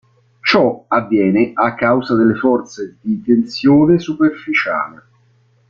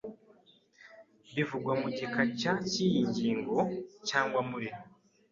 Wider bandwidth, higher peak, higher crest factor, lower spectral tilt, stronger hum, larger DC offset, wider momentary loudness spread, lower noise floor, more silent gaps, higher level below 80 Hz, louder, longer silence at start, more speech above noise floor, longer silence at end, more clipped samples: about the same, 7.2 kHz vs 7.6 kHz; first, 0 dBFS vs -12 dBFS; about the same, 16 dB vs 20 dB; first, -7 dB/octave vs -5 dB/octave; neither; neither; about the same, 9 LU vs 10 LU; second, -55 dBFS vs -63 dBFS; neither; first, -54 dBFS vs -70 dBFS; first, -15 LUFS vs -32 LUFS; first, 0.45 s vs 0.05 s; first, 40 dB vs 32 dB; first, 0.75 s vs 0.45 s; neither